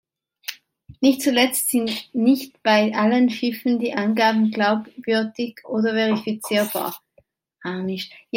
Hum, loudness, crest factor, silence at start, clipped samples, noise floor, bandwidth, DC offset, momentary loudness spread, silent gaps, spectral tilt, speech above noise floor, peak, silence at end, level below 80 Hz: none; -21 LUFS; 18 dB; 0.5 s; under 0.1%; -61 dBFS; 16.5 kHz; under 0.1%; 13 LU; none; -4 dB/octave; 40 dB; -2 dBFS; 0 s; -68 dBFS